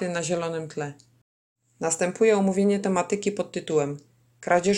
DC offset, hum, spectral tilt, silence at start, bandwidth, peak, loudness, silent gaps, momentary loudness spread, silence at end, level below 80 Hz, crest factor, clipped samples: under 0.1%; none; -5 dB/octave; 0 s; 12 kHz; -8 dBFS; -25 LUFS; 1.21-1.56 s; 13 LU; 0 s; -66 dBFS; 18 dB; under 0.1%